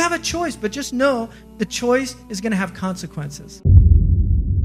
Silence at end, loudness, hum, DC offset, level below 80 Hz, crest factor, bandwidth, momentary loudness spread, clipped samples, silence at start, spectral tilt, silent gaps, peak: 0 s; -19 LUFS; none; under 0.1%; -24 dBFS; 18 dB; 13.5 kHz; 15 LU; under 0.1%; 0 s; -6 dB/octave; none; 0 dBFS